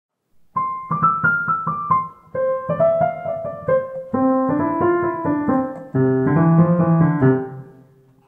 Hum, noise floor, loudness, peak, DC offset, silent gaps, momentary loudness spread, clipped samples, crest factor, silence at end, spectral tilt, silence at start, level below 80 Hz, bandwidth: none; -50 dBFS; -19 LUFS; -4 dBFS; under 0.1%; none; 10 LU; under 0.1%; 16 dB; 0.55 s; -12 dB/octave; 0.55 s; -56 dBFS; 3 kHz